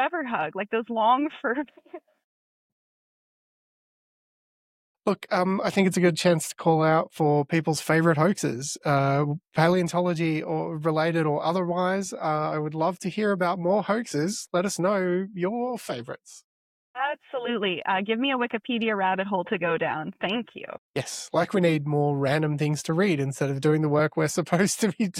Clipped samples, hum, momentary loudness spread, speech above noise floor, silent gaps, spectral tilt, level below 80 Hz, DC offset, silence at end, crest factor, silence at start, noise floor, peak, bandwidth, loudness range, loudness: under 0.1%; none; 8 LU; over 65 dB; 2.24-4.95 s, 16.44-16.94 s, 20.78-20.94 s; -5.5 dB/octave; -68 dBFS; under 0.1%; 0 s; 20 dB; 0 s; under -90 dBFS; -6 dBFS; 15.5 kHz; 6 LU; -25 LUFS